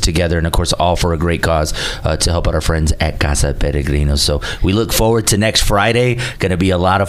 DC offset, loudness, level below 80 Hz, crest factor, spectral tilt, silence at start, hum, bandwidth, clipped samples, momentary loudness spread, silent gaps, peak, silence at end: 0.5%; -15 LUFS; -22 dBFS; 14 dB; -4.5 dB/octave; 0 s; none; 16 kHz; under 0.1%; 5 LU; none; 0 dBFS; 0 s